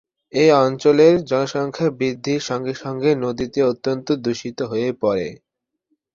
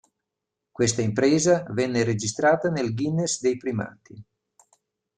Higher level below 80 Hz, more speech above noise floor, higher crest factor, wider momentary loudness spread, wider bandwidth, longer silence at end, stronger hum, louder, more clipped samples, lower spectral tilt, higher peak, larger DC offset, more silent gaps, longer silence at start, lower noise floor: about the same, -58 dBFS vs -60 dBFS; second, 53 dB vs 61 dB; about the same, 18 dB vs 16 dB; first, 11 LU vs 7 LU; second, 7.6 kHz vs 10.5 kHz; second, 0.8 s vs 0.95 s; neither; first, -19 LUFS vs -23 LUFS; neither; about the same, -6 dB/octave vs -5 dB/octave; first, -2 dBFS vs -8 dBFS; neither; neither; second, 0.35 s vs 0.8 s; second, -71 dBFS vs -84 dBFS